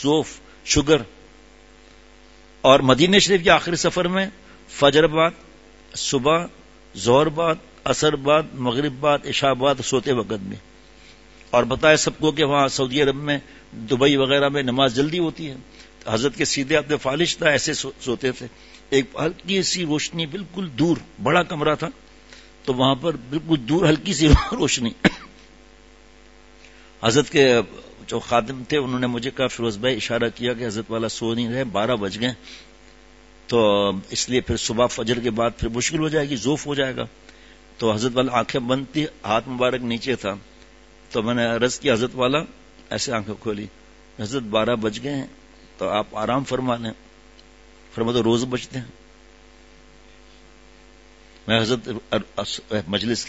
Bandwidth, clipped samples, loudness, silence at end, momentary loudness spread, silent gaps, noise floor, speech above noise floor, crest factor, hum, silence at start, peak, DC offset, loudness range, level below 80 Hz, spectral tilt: 8 kHz; under 0.1%; -21 LUFS; 0 s; 13 LU; none; -49 dBFS; 28 dB; 22 dB; none; 0 s; 0 dBFS; 0.2%; 7 LU; -42 dBFS; -4.5 dB/octave